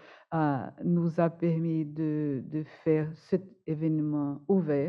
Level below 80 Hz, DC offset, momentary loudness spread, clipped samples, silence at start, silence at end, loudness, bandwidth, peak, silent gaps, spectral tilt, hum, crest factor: -72 dBFS; under 0.1%; 5 LU; under 0.1%; 0.05 s; 0 s; -30 LUFS; 5.6 kHz; -12 dBFS; none; -11 dB/octave; none; 16 dB